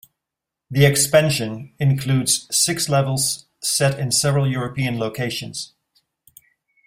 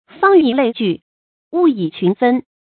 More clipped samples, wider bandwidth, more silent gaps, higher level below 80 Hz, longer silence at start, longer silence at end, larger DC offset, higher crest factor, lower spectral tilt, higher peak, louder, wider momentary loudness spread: neither; first, 16 kHz vs 4.5 kHz; second, none vs 1.02-1.51 s; first, -54 dBFS vs -62 dBFS; first, 0.7 s vs 0.2 s; first, 1.2 s vs 0.25 s; neither; about the same, 20 dB vs 16 dB; second, -4 dB/octave vs -11.5 dB/octave; about the same, -2 dBFS vs 0 dBFS; second, -19 LUFS vs -15 LUFS; about the same, 11 LU vs 9 LU